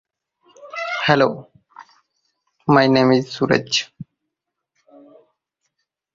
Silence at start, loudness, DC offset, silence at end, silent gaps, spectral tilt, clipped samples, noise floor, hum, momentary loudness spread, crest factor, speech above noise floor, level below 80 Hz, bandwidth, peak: 0.65 s; -18 LUFS; under 0.1%; 2.1 s; none; -5 dB/octave; under 0.1%; -80 dBFS; none; 17 LU; 20 dB; 64 dB; -58 dBFS; 7.6 kHz; -2 dBFS